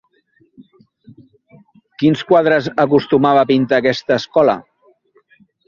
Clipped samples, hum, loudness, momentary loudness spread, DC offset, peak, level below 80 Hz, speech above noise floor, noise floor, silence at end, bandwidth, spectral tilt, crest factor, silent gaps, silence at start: under 0.1%; none; -15 LUFS; 4 LU; under 0.1%; -2 dBFS; -58 dBFS; 44 dB; -58 dBFS; 1.05 s; 7.2 kHz; -7 dB/octave; 16 dB; none; 2 s